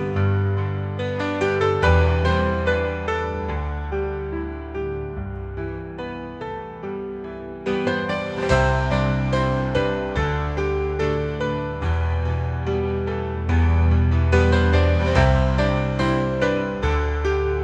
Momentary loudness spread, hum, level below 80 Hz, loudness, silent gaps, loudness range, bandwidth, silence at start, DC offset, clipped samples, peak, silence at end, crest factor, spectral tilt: 13 LU; none; -30 dBFS; -22 LUFS; none; 10 LU; 8.2 kHz; 0 s; under 0.1%; under 0.1%; -4 dBFS; 0 s; 18 dB; -7.5 dB/octave